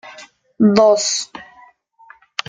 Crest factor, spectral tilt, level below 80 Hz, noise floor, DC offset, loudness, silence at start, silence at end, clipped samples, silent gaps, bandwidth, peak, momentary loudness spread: 18 dB; -4 dB/octave; -60 dBFS; -49 dBFS; under 0.1%; -15 LUFS; 0.05 s; 1.05 s; under 0.1%; none; 9.6 kHz; 0 dBFS; 24 LU